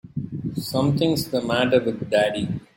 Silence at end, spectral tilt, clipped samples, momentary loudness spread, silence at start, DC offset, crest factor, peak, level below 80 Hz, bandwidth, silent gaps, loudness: 0.15 s; -6 dB/octave; under 0.1%; 10 LU; 0.05 s; under 0.1%; 18 dB; -6 dBFS; -54 dBFS; 17 kHz; none; -23 LUFS